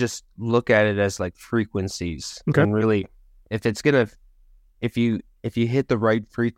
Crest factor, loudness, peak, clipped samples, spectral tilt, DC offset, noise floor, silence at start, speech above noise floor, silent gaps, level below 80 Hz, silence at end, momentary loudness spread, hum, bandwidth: 18 dB; -23 LUFS; -4 dBFS; under 0.1%; -6 dB/octave; under 0.1%; -54 dBFS; 0 s; 32 dB; none; -50 dBFS; 0.05 s; 11 LU; none; 15.5 kHz